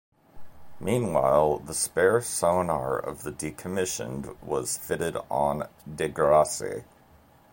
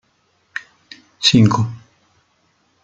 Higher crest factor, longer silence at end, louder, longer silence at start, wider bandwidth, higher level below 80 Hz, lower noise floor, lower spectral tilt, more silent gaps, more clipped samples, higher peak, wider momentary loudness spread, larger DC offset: about the same, 20 dB vs 20 dB; second, 0.7 s vs 1.05 s; second, -26 LUFS vs -15 LUFS; second, 0.35 s vs 1.2 s; first, 16.5 kHz vs 9.2 kHz; about the same, -52 dBFS vs -54 dBFS; second, -57 dBFS vs -62 dBFS; about the same, -4.5 dB/octave vs -5 dB/octave; neither; neither; second, -8 dBFS vs -2 dBFS; second, 14 LU vs 20 LU; neither